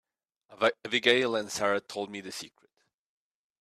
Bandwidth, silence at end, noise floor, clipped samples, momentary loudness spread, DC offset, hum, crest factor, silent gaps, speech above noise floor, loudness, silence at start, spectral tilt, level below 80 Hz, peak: 14 kHz; 1.15 s; -64 dBFS; under 0.1%; 16 LU; under 0.1%; none; 24 dB; none; 35 dB; -28 LUFS; 0.5 s; -2.5 dB/octave; -74 dBFS; -8 dBFS